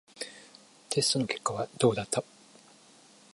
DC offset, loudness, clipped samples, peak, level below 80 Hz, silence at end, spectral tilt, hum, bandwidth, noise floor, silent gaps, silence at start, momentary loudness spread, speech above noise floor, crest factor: under 0.1%; -30 LUFS; under 0.1%; -10 dBFS; -68 dBFS; 1.1 s; -3.5 dB/octave; none; 12 kHz; -58 dBFS; none; 0.15 s; 15 LU; 28 dB; 22 dB